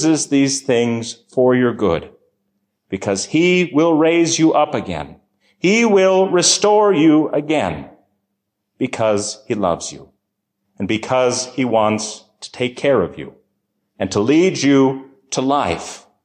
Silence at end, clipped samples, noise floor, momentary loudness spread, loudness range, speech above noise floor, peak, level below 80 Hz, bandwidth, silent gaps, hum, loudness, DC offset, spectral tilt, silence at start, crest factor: 0.25 s; under 0.1%; -75 dBFS; 14 LU; 6 LU; 59 dB; -2 dBFS; -50 dBFS; 10.5 kHz; none; none; -16 LUFS; under 0.1%; -4 dB/octave; 0 s; 14 dB